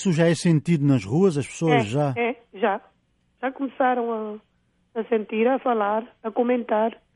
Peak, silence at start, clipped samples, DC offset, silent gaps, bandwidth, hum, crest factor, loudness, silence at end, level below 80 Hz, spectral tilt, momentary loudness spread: -8 dBFS; 0 s; under 0.1%; under 0.1%; none; 11.5 kHz; none; 16 dB; -23 LUFS; 0.2 s; -64 dBFS; -6.5 dB/octave; 11 LU